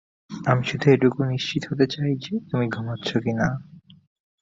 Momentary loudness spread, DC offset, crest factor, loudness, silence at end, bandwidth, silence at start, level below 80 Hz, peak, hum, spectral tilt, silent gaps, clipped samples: 9 LU; under 0.1%; 20 dB; -23 LUFS; 0.65 s; 7.8 kHz; 0.3 s; -56 dBFS; -4 dBFS; none; -7 dB/octave; none; under 0.1%